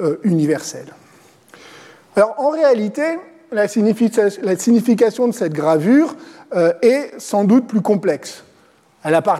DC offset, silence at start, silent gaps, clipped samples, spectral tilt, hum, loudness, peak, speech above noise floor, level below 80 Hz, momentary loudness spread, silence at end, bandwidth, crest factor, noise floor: under 0.1%; 0 s; none; under 0.1%; -6 dB/octave; none; -16 LUFS; -2 dBFS; 37 dB; -68 dBFS; 10 LU; 0 s; 14.5 kHz; 14 dB; -53 dBFS